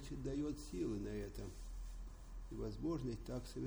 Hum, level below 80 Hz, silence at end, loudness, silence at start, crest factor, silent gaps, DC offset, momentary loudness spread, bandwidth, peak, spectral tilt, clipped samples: none; -52 dBFS; 0 s; -46 LUFS; 0 s; 14 dB; none; under 0.1%; 11 LU; over 20 kHz; -32 dBFS; -7 dB/octave; under 0.1%